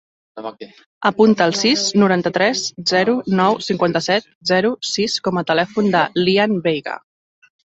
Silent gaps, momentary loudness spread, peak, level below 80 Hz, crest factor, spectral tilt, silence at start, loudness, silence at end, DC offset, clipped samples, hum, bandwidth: 0.86-1.01 s, 4.35-4.41 s; 8 LU; -2 dBFS; -60 dBFS; 16 dB; -4.5 dB/octave; 0.35 s; -17 LUFS; 0.65 s; under 0.1%; under 0.1%; none; 8.2 kHz